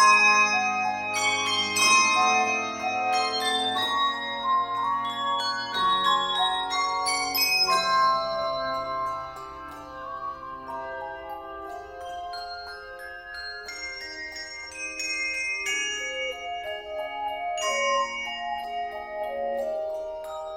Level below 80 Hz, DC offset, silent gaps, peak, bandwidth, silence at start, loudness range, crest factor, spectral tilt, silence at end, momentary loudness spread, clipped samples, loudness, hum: -60 dBFS; under 0.1%; none; -8 dBFS; 16 kHz; 0 s; 14 LU; 20 dB; -0.5 dB/octave; 0 s; 17 LU; under 0.1%; -25 LUFS; none